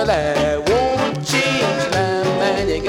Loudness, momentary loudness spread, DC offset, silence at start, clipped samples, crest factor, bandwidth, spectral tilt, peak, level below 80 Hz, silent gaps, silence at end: -18 LUFS; 2 LU; under 0.1%; 0 s; under 0.1%; 14 dB; 17.5 kHz; -4.5 dB/octave; -4 dBFS; -38 dBFS; none; 0 s